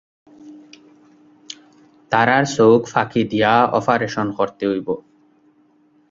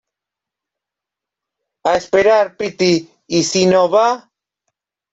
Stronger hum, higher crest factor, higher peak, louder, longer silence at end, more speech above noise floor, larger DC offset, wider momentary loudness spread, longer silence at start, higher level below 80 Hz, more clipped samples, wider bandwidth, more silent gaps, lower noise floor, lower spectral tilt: second, none vs 50 Hz at -60 dBFS; about the same, 20 dB vs 16 dB; about the same, 0 dBFS vs -2 dBFS; about the same, -17 LUFS vs -15 LUFS; first, 1.1 s vs 0.95 s; second, 40 dB vs 71 dB; neither; first, 19 LU vs 8 LU; second, 0.45 s vs 1.85 s; about the same, -58 dBFS vs -56 dBFS; neither; about the same, 7.8 kHz vs 8 kHz; neither; second, -56 dBFS vs -85 dBFS; first, -5.5 dB/octave vs -4 dB/octave